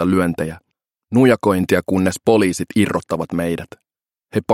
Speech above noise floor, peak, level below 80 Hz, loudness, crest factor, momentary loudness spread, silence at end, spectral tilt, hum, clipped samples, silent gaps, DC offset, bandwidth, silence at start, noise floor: 33 dB; 0 dBFS; -50 dBFS; -18 LUFS; 18 dB; 11 LU; 0 s; -6 dB/octave; none; under 0.1%; none; under 0.1%; 16 kHz; 0 s; -50 dBFS